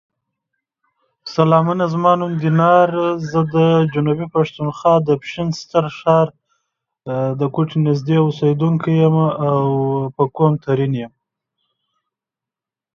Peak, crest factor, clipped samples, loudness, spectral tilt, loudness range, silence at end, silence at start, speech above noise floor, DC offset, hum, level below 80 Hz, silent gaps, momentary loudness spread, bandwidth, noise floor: 0 dBFS; 16 dB; under 0.1%; -17 LUFS; -8.5 dB/octave; 4 LU; 1.85 s; 1.25 s; 72 dB; under 0.1%; none; -56 dBFS; none; 8 LU; 7.2 kHz; -88 dBFS